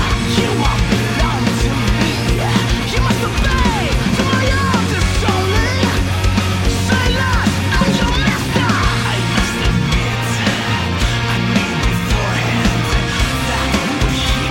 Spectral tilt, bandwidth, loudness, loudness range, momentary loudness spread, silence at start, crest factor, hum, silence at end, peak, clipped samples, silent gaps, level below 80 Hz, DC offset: -5 dB/octave; 16.5 kHz; -16 LUFS; 1 LU; 2 LU; 0 s; 12 dB; none; 0 s; -2 dBFS; under 0.1%; none; -22 dBFS; under 0.1%